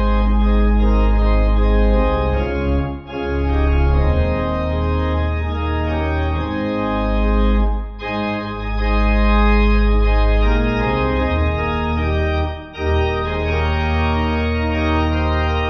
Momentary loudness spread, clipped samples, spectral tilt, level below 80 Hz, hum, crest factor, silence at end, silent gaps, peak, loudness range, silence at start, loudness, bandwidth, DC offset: 5 LU; under 0.1%; -8.5 dB/octave; -18 dBFS; none; 12 dB; 0 s; none; -4 dBFS; 3 LU; 0 s; -18 LUFS; 6 kHz; under 0.1%